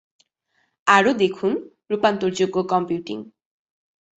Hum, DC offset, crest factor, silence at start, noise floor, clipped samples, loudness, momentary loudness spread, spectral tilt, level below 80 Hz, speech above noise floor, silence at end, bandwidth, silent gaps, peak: none; under 0.1%; 20 dB; 0.85 s; -69 dBFS; under 0.1%; -21 LUFS; 13 LU; -5 dB/octave; -66 dBFS; 49 dB; 0.9 s; 8.2 kHz; none; -2 dBFS